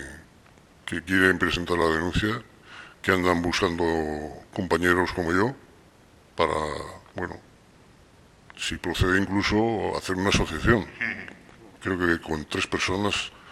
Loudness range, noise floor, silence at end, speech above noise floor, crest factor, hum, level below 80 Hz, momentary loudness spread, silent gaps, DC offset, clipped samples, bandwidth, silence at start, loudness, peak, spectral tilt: 5 LU; -55 dBFS; 0 s; 30 dB; 22 dB; none; -44 dBFS; 14 LU; none; under 0.1%; under 0.1%; 15.5 kHz; 0 s; -25 LUFS; -4 dBFS; -5 dB/octave